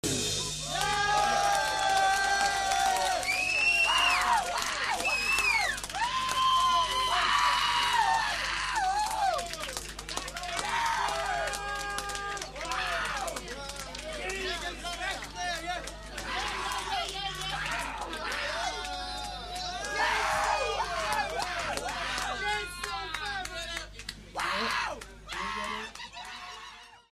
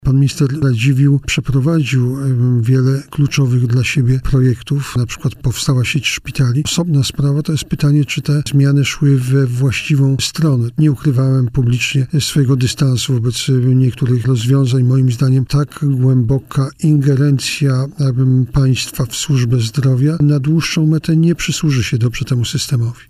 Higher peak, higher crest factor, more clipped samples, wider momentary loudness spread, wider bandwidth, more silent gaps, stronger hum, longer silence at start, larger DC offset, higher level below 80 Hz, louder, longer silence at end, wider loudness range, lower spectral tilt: second, -12 dBFS vs -2 dBFS; first, 20 dB vs 10 dB; neither; first, 12 LU vs 4 LU; about the same, 15.5 kHz vs 15 kHz; neither; neither; about the same, 0.05 s vs 0.05 s; neither; second, -48 dBFS vs -36 dBFS; second, -29 LUFS vs -14 LUFS; about the same, 0.15 s vs 0.15 s; first, 8 LU vs 2 LU; second, -1 dB/octave vs -6 dB/octave